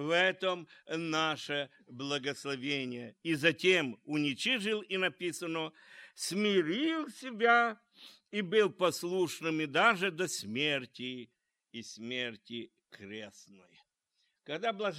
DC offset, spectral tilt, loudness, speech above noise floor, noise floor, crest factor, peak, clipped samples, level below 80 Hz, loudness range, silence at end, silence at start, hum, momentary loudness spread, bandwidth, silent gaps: under 0.1%; -3.5 dB/octave; -32 LUFS; 46 dB; -80 dBFS; 22 dB; -10 dBFS; under 0.1%; -84 dBFS; 10 LU; 0 s; 0 s; none; 17 LU; 16 kHz; none